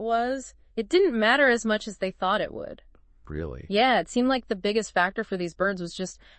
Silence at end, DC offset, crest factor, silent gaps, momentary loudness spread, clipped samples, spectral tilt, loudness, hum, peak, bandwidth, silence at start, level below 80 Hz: 0.25 s; under 0.1%; 18 dB; none; 15 LU; under 0.1%; -4 dB/octave; -25 LUFS; none; -8 dBFS; 8.8 kHz; 0 s; -52 dBFS